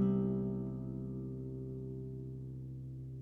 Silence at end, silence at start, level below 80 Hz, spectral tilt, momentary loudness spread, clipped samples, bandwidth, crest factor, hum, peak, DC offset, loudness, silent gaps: 0 s; 0 s; -56 dBFS; -12 dB/octave; 11 LU; under 0.1%; 3.2 kHz; 16 dB; none; -22 dBFS; under 0.1%; -41 LUFS; none